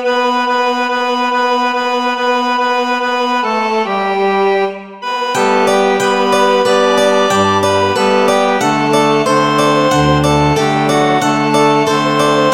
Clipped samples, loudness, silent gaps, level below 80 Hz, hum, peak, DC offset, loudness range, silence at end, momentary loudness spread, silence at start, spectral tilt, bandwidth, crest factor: under 0.1%; -12 LUFS; none; -40 dBFS; none; 0 dBFS; 0.4%; 3 LU; 0 s; 4 LU; 0 s; -4.5 dB/octave; 16.5 kHz; 12 dB